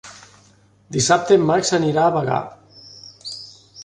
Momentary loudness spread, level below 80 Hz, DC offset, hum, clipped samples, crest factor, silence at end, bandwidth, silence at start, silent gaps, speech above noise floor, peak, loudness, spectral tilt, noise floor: 24 LU; -56 dBFS; under 0.1%; none; under 0.1%; 18 dB; 0 s; 11 kHz; 0.05 s; none; 36 dB; -2 dBFS; -18 LUFS; -4.5 dB/octave; -54 dBFS